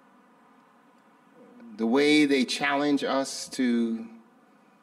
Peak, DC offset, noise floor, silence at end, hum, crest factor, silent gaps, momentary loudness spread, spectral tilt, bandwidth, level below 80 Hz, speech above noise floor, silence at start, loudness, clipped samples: -10 dBFS; under 0.1%; -59 dBFS; 0.65 s; none; 18 dB; none; 13 LU; -3.5 dB/octave; 13.5 kHz; -76 dBFS; 34 dB; 1.6 s; -25 LUFS; under 0.1%